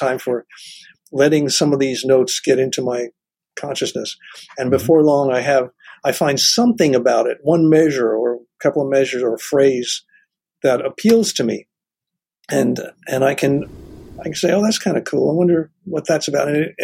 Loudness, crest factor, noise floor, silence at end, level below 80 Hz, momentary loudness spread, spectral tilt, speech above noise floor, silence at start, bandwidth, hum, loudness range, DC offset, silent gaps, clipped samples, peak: -17 LUFS; 16 dB; -84 dBFS; 0 s; -56 dBFS; 13 LU; -4.5 dB/octave; 68 dB; 0 s; 16.5 kHz; none; 4 LU; under 0.1%; none; under 0.1%; -2 dBFS